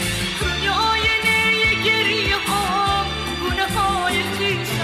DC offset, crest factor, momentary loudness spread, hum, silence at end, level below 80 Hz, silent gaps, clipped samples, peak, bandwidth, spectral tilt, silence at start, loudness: under 0.1%; 12 dB; 6 LU; none; 0 s; -36 dBFS; none; under 0.1%; -8 dBFS; 16 kHz; -3 dB/octave; 0 s; -18 LUFS